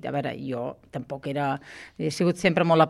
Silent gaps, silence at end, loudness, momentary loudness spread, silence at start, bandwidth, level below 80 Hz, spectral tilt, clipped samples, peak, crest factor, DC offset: none; 0 s; -27 LUFS; 13 LU; 0.05 s; 12.5 kHz; -60 dBFS; -6 dB/octave; under 0.1%; -6 dBFS; 20 dB; under 0.1%